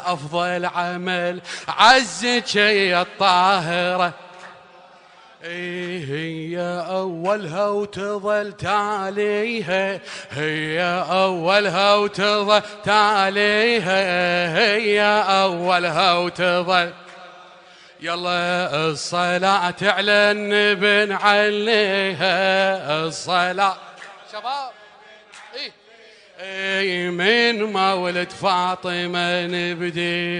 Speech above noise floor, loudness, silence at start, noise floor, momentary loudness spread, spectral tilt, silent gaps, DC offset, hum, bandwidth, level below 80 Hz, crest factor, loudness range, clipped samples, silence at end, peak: 28 dB; -19 LUFS; 0 s; -48 dBFS; 11 LU; -4 dB/octave; none; under 0.1%; none; 10 kHz; -62 dBFS; 20 dB; 8 LU; under 0.1%; 0 s; 0 dBFS